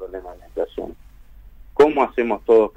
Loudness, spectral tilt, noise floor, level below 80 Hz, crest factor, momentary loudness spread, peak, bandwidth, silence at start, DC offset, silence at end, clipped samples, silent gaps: -19 LUFS; -6.5 dB/octave; -44 dBFS; -44 dBFS; 16 dB; 18 LU; -4 dBFS; 8 kHz; 0 s; under 0.1%; 0.05 s; under 0.1%; none